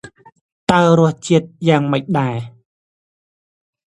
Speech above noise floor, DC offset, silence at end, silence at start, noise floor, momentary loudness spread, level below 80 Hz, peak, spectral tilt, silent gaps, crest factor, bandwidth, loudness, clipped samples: over 75 dB; under 0.1%; 1.5 s; 0.05 s; under -90 dBFS; 12 LU; -54 dBFS; 0 dBFS; -6.5 dB/octave; 0.41-0.67 s; 18 dB; 11 kHz; -16 LUFS; under 0.1%